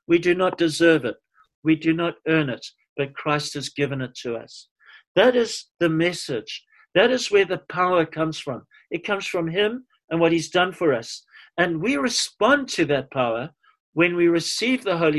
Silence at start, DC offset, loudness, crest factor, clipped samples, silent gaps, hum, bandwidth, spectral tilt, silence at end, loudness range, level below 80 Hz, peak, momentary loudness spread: 0.1 s; under 0.1%; -22 LUFS; 20 dB; under 0.1%; 1.54-1.63 s, 2.89-2.96 s, 4.71-4.76 s, 5.07-5.15 s, 5.71-5.75 s, 10.04-10.08 s, 13.80-13.93 s; none; 12.5 kHz; -4.5 dB/octave; 0 s; 3 LU; -62 dBFS; -4 dBFS; 14 LU